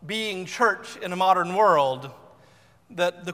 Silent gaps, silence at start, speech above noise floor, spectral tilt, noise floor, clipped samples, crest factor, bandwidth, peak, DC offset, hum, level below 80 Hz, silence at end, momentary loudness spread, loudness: none; 0 s; 33 dB; -4 dB/octave; -56 dBFS; under 0.1%; 18 dB; 15.5 kHz; -6 dBFS; under 0.1%; none; -70 dBFS; 0 s; 14 LU; -23 LUFS